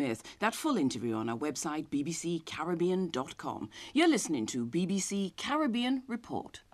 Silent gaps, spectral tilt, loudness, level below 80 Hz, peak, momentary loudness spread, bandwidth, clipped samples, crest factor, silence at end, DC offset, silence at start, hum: none; -4.5 dB/octave; -33 LUFS; -68 dBFS; -14 dBFS; 10 LU; 14.5 kHz; under 0.1%; 18 dB; 0.15 s; under 0.1%; 0 s; none